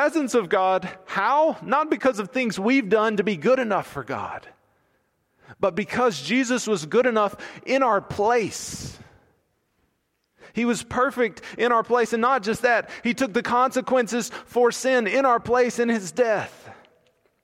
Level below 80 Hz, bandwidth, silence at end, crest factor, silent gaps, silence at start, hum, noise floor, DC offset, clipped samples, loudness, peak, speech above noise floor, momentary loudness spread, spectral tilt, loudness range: -60 dBFS; 15.5 kHz; 0.7 s; 16 dB; none; 0 s; none; -72 dBFS; under 0.1%; under 0.1%; -22 LUFS; -8 dBFS; 50 dB; 9 LU; -4.5 dB/octave; 5 LU